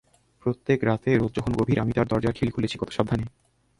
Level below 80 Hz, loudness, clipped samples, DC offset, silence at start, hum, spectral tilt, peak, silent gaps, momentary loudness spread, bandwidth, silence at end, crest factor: -46 dBFS; -25 LUFS; under 0.1%; under 0.1%; 0.45 s; none; -7.5 dB/octave; -4 dBFS; none; 7 LU; 11.5 kHz; 0.5 s; 20 dB